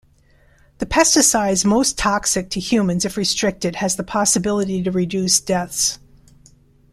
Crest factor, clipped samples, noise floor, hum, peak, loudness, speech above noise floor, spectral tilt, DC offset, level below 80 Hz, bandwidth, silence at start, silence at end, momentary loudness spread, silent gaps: 18 dB; under 0.1%; -54 dBFS; none; -2 dBFS; -18 LUFS; 35 dB; -3 dB/octave; under 0.1%; -42 dBFS; 15.5 kHz; 0.8 s; 0.95 s; 7 LU; none